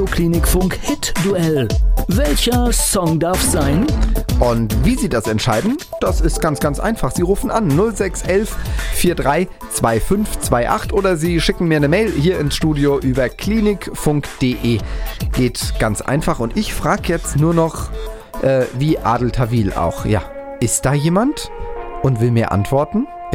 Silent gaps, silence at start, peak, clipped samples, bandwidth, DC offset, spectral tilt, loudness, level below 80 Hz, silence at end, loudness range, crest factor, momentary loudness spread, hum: none; 0 s; 0 dBFS; under 0.1%; 17 kHz; under 0.1%; -5.5 dB/octave; -17 LUFS; -24 dBFS; 0 s; 2 LU; 16 dB; 6 LU; none